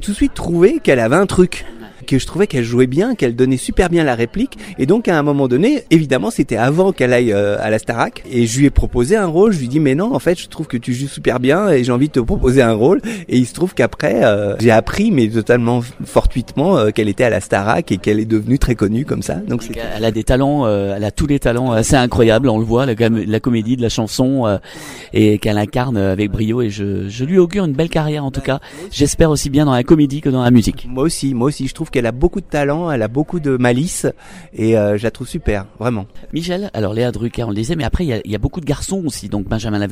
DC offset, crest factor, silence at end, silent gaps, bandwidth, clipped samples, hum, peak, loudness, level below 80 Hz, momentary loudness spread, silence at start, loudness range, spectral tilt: under 0.1%; 14 dB; 0 s; none; 16 kHz; under 0.1%; none; 0 dBFS; -16 LUFS; -30 dBFS; 9 LU; 0 s; 4 LU; -6 dB/octave